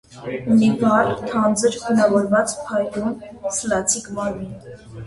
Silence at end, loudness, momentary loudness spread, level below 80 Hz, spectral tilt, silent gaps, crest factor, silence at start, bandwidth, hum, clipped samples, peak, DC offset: 0 s; -20 LUFS; 14 LU; -50 dBFS; -4.5 dB/octave; none; 16 dB; 0.1 s; 11.5 kHz; none; under 0.1%; -4 dBFS; under 0.1%